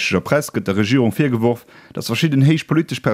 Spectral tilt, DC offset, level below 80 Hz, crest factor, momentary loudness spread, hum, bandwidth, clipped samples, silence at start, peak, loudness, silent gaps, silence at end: -6 dB/octave; under 0.1%; -54 dBFS; 16 dB; 9 LU; none; 16 kHz; under 0.1%; 0 s; -2 dBFS; -18 LUFS; none; 0 s